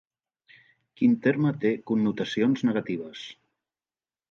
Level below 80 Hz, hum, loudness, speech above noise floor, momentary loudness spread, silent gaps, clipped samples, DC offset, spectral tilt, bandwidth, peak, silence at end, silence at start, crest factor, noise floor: -72 dBFS; none; -26 LUFS; over 65 dB; 14 LU; none; under 0.1%; under 0.1%; -7.5 dB/octave; 7.2 kHz; -10 dBFS; 0.95 s; 1 s; 18 dB; under -90 dBFS